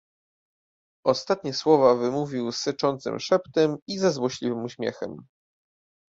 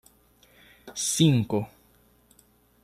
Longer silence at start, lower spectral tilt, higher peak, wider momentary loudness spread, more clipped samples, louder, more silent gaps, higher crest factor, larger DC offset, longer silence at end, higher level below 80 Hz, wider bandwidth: first, 1.05 s vs 0.85 s; about the same, -5 dB/octave vs -5 dB/octave; about the same, -6 dBFS vs -8 dBFS; second, 12 LU vs 18 LU; neither; about the same, -25 LUFS vs -24 LUFS; first, 3.82-3.86 s vs none; about the same, 20 dB vs 22 dB; neither; second, 0.95 s vs 1.15 s; second, -68 dBFS vs -62 dBFS; second, 7.8 kHz vs 13 kHz